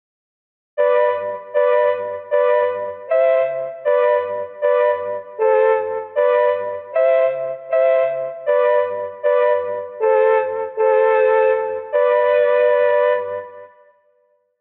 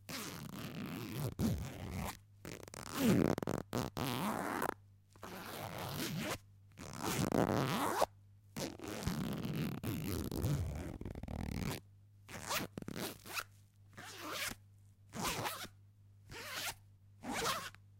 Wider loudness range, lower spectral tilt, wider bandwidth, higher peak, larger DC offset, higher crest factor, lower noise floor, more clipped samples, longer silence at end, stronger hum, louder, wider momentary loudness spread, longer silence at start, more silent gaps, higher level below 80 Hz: second, 2 LU vs 6 LU; second, -0.5 dB/octave vs -4.5 dB/octave; second, 4.1 kHz vs 17 kHz; first, -6 dBFS vs -18 dBFS; neither; second, 12 dB vs 24 dB; about the same, -62 dBFS vs -62 dBFS; neither; first, 0.95 s vs 0 s; neither; first, -18 LUFS vs -40 LUFS; second, 9 LU vs 16 LU; first, 0.75 s vs 0 s; neither; second, -72 dBFS vs -56 dBFS